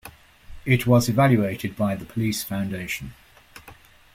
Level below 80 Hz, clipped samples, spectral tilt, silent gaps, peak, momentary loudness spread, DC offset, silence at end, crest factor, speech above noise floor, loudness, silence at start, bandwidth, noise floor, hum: -50 dBFS; under 0.1%; -6 dB/octave; none; -6 dBFS; 13 LU; under 0.1%; 0.4 s; 18 dB; 27 dB; -23 LUFS; 0.05 s; 16.5 kHz; -49 dBFS; none